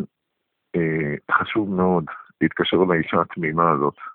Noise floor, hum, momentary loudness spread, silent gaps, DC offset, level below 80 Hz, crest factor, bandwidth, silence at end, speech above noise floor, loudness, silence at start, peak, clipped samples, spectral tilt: -78 dBFS; none; 6 LU; none; under 0.1%; -56 dBFS; 18 dB; 4.1 kHz; 0 s; 57 dB; -21 LUFS; 0 s; -2 dBFS; under 0.1%; -11 dB/octave